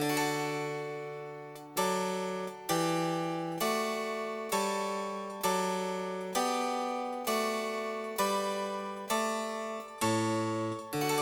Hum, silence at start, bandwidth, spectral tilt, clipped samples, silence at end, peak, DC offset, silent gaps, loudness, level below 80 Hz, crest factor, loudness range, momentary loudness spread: 60 Hz at -75 dBFS; 0 s; 19 kHz; -4 dB/octave; under 0.1%; 0 s; -18 dBFS; under 0.1%; none; -33 LUFS; -74 dBFS; 16 dB; 1 LU; 7 LU